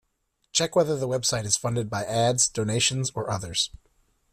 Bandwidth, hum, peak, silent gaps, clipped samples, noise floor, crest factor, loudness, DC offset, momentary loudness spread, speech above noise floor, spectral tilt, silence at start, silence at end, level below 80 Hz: 15 kHz; none; -8 dBFS; none; under 0.1%; -74 dBFS; 18 dB; -25 LUFS; under 0.1%; 6 LU; 48 dB; -3 dB/octave; 0.55 s; 0.65 s; -54 dBFS